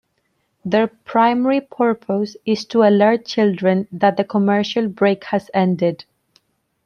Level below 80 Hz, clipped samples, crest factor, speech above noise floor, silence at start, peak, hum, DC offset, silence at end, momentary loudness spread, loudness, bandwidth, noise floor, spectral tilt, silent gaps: -64 dBFS; under 0.1%; 16 dB; 51 dB; 0.65 s; -2 dBFS; none; under 0.1%; 0.9 s; 7 LU; -18 LUFS; 6.8 kHz; -68 dBFS; -7 dB/octave; none